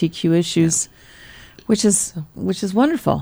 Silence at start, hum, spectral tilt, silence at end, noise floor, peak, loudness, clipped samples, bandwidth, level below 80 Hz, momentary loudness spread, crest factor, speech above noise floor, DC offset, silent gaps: 0 s; none; -4.5 dB/octave; 0 s; -43 dBFS; -2 dBFS; -19 LUFS; under 0.1%; over 20 kHz; -50 dBFS; 10 LU; 16 dB; 24 dB; under 0.1%; none